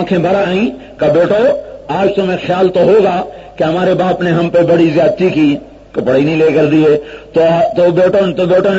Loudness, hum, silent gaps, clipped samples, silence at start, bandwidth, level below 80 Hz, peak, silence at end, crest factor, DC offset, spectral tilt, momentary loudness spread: -12 LUFS; none; none; under 0.1%; 0 s; 7.8 kHz; -44 dBFS; 0 dBFS; 0 s; 10 dB; under 0.1%; -7.5 dB/octave; 8 LU